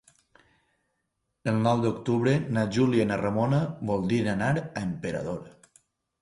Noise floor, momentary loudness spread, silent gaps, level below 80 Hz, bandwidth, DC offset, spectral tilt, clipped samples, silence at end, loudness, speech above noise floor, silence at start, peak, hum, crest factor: -79 dBFS; 9 LU; none; -56 dBFS; 11.5 kHz; under 0.1%; -7.5 dB/octave; under 0.1%; 0.75 s; -27 LUFS; 53 dB; 1.45 s; -10 dBFS; none; 18 dB